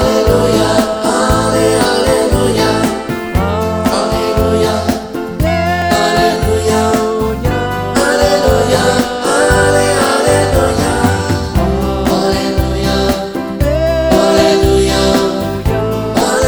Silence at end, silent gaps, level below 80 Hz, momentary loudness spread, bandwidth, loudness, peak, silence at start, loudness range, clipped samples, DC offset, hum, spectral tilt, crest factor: 0 s; none; -24 dBFS; 5 LU; over 20 kHz; -12 LUFS; 0 dBFS; 0 s; 3 LU; under 0.1%; under 0.1%; none; -5 dB/octave; 12 dB